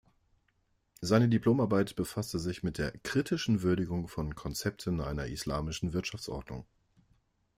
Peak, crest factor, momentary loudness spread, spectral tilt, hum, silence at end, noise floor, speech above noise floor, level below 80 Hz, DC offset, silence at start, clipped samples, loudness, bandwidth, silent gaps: -14 dBFS; 18 dB; 11 LU; -6 dB/octave; none; 0.95 s; -74 dBFS; 43 dB; -50 dBFS; under 0.1%; 1 s; under 0.1%; -32 LUFS; 16 kHz; none